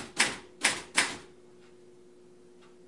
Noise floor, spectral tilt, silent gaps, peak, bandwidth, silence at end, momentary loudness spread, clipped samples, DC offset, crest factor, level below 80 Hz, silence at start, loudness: -56 dBFS; 0 dB/octave; none; -8 dBFS; 11.5 kHz; 1.6 s; 5 LU; under 0.1%; 0.1%; 26 dB; -70 dBFS; 0 s; -28 LUFS